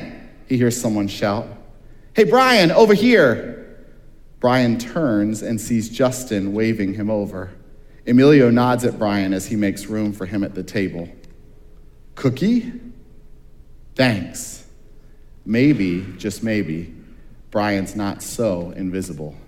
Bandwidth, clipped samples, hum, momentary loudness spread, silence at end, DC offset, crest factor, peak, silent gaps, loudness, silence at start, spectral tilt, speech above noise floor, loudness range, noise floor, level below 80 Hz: 16.5 kHz; under 0.1%; none; 19 LU; 0.05 s; under 0.1%; 20 dB; 0 dBFS; none; -19 LUFS; 0 s; -5.5 dB/octave; 24 dB; 8 LU; -42 dBFS; -44 dBFS